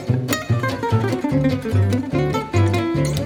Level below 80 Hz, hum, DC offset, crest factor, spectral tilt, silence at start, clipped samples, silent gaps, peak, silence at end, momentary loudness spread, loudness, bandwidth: -40 dBFS; none; under 0.1%; 14 dB; -6.5 dB/octave; 0 s; under 0.1%; none; -6 dBFS; 0 s; 2 LU; -20 LUFS; over 20 kHz